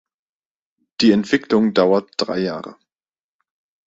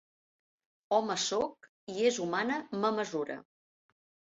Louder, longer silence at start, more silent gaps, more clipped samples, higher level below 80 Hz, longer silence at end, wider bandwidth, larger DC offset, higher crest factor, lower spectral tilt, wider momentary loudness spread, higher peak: first, -18 LUFS vs -32 LUFS; about the same, 1 s vs 0.9 s; second, none vs 1.69-1.87 s; neither; first, -60 dBFS vs -76 dBFS; first, 1.15 s vs 0.95 s; about the same, 7.8 kHz vs 8 kHz; neither; about the same, 18 dB vs 20 dB; first, -5.5 dB/octave vs -2.5 dB/octave; first, 16 LU vs 11 LU; first, -2 dBFS vs -14 dBFS